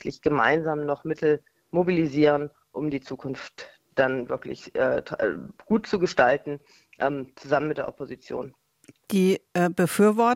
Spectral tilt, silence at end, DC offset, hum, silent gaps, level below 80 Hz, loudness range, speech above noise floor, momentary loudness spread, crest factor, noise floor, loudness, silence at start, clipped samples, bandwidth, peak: -6 dB/octave; 0 s; under 0.1%; none; none; -60 dBFS; 3 LU; 32 dB; 14 LU; 22 dB; -57 dBFS; -25 LUFS; 0.05 s; under 0.1%; 16.5 kHz; -4 dBFS